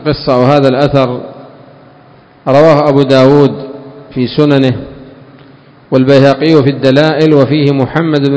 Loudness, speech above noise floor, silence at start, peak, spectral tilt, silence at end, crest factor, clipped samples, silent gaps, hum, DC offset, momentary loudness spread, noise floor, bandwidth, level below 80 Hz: -8 LUFS; 32 dB; 0 s; 0 dBFS; -8 dB/octave; 0 s; 10 dB; 3%; none; none; under 0.1%; 16 LU; -40 dBFS; 8 kHz; -42 dBFS